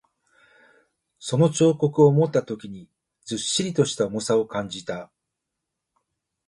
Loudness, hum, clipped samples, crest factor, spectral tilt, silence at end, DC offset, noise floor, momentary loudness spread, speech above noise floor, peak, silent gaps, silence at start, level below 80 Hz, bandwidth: -22 LUFS; none; under 0.1%; 20 dB; -5.5 dB/octave; 1.4 s; under 0.1%; -83 dBFS; 17 LU; 61 dB; -4 dBFS; none; 1.2 s; -62 dBFS; 11.5 kHz